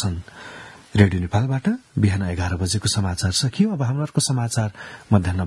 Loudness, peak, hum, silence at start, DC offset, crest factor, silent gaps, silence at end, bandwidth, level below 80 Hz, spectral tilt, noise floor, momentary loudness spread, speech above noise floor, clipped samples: -21 LUFS; 0 dBFS; none; 0 s; under 0.1%; 22 dB; none; 0 s; 12 kHz; -48 dBFS; -5 dB/octave; -40 dBFS; 15 LU; 20 dB; under 0.1%